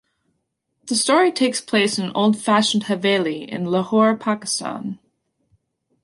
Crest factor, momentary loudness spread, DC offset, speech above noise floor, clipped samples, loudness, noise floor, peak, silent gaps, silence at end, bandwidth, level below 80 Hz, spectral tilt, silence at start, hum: 16 dB; 10 LU; under 0.1%; 54 dB; under 0.1%; -19 LUFS; -74 dBFS; -4 dBFS; none; 1.1 s; 11.5 kHz; -68 dBFS; -4 dB/octave; 0.85 s; none